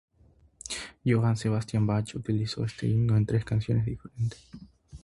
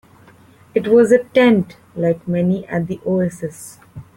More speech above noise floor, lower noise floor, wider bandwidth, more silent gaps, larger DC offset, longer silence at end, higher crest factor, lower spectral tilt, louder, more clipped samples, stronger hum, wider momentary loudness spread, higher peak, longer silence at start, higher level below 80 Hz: first, 34 dB vs 30 dB; first, -61 dBFS vs -47 dBFS; second, 11.5 kHz vs 16.5 kHz; neither; neither; about the same, 0.05 s vs 0.15 s; about the same, 16 dB vs 16 dB; about the same, -6.5 dB/octave vs -7 dB/octave; second, -29 LUFS vs -17 LUFS; neither; neither; second, 11 LU vs 17 LU; second, -12 dBFS vs -2 dBFS; about the same, 0.65 s vs 0.75 s; first, -50 dBFS vs -56 dBFS